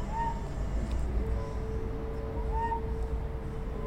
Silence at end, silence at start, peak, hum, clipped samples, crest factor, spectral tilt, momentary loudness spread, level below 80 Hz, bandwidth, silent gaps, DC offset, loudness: 0 s; 0 s; -20 dBFS; none; under 0.1%; 12 dB; -7.5 dB/octave; 4 LU; -34 dBFS; 9 kHz; none; under 0.1%; -35 LUFS